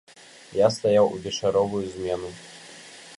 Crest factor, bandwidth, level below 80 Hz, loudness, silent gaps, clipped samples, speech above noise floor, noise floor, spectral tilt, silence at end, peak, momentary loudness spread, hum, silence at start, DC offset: 20 dB; 11.5 kHz; -56 dBFS; -24 LUFS; none; under 0.1%; 22 dB; -45 dBFS; -5 dB/octave; 0.05 s; -6 dBFS; 22 LU; none; 0.5 s; under 0.1%